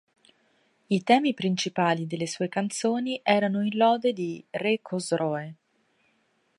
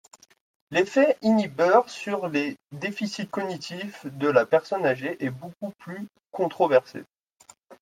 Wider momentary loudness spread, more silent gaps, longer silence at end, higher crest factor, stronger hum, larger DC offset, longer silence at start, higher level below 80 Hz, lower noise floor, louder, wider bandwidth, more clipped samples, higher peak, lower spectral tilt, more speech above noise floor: second, 8 LU vs 17 LU; neither; first, 1.05 s vs 0.1 s; about the same, 20 dB vs 20 dB; neither; neither; first, 0.9 s vs 0.7 s; about the same, -76 dBFS vs -74 dBFS; first, -69 dBFS vs -56 dBFS; about the same, -26 LUFS vs -25 LUFS; second, 11.5 kHz vs 15 kHz; neither; about the same, -6 dBFS vs -6 dBFS; about the same, -5 dB/octave vs -5.5 dB/octave; first, 44 dB vs 31 dB